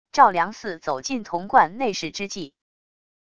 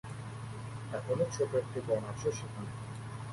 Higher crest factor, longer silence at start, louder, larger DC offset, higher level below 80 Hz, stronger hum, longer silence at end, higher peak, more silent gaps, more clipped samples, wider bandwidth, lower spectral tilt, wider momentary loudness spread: first, 22 dB vs 16 dB; about the same, 0.15 s vs 0.05 s; first, -22 LUFS vs -37 LUFS; first, 0.4% vs under 0.1%; about the same, -60 dBFS vs -60 dBFS; neither; first, 0.8 s vs 0 s; first, -2 dBFS vs -20 dBFS; neither; neither; second, 10 kHz vs 11.5 kHz; second, -3.5 dB/octave vs -6 dB/octave; first, 14 LU vs 11 LU